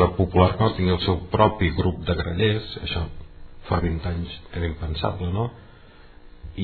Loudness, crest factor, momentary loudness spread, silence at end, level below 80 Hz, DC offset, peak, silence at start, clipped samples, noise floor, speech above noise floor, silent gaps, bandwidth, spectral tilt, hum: -24 LUFS; 22 dB; 10 LU; 0 s; -36 dBFS; under 0.1%; -2 dBFS; 0 s; under 0.1%; -47 dBFS; 24 dB; none; 4.6 kHz; -10 dB/octave; none